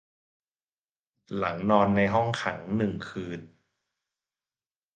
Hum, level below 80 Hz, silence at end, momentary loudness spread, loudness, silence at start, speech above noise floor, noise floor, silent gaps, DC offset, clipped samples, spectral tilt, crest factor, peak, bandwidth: none; -58 dBFS; 1.5 s; 15 LU; -27 LUFS; 1.3 s; over 63 dB; under -90 dBFS; none; under 0.1%; under 0.1%; -7 dB/octave; 22 dB; -8 dBFS; 8.8 kHz